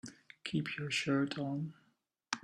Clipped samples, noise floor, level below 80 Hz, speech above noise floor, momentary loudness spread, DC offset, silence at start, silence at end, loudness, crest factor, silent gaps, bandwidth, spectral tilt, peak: under 0.1%; -76 dBFS; -74 dBFS; 41 dB; 13 LU; under 0.1%; 0.05 s; 0.05 s; -37 LUFS; 26 dB; none; 12.5 kHz; -5 dB/octave; -14 dBFS